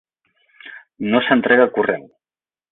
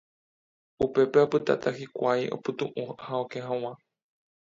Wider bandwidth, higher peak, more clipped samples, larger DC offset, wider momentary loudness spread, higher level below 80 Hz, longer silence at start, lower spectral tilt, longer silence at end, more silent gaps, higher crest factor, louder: second, 4.1 kHz vs 7.6 kHz; first, -2 dBFS vs -8 dBFS; neither; neither; first, 24 LU vs 11 LU; about the same, -64 dBFS vs -64 dBFS; second, 0.65 s vs 0.8 s; first, -10 dB/octave vs -6.5 dB/octave; second, 0.7 s vs 0.85 s; neither; about the same, 18 dB vs 20 dB; first, -17 LUFS vs -28 LUFS